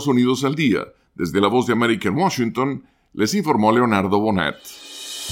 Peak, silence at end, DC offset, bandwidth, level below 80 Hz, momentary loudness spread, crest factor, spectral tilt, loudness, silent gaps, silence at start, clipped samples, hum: -2 dBFS; 0 s; under 0.1%; 17 kHz; -56 dBFS; 16 LU; 18 dB; -5.5 dB/octave; -19 LUFS; none; 0 s; under 0.1%; none